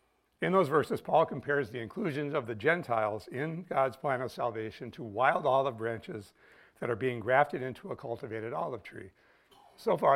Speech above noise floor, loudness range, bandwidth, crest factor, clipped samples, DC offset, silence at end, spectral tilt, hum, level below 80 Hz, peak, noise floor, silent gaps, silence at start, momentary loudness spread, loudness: 30 dB; 4 LU; 15.5 kHz; 22 dB; under 0.1%; under 0.1%; 0 s; -7 dB/octave; none; -72 dBFS; -10 dBFS; -61 dBFS; none; 0.4 s; 13 LU; -32 LUFS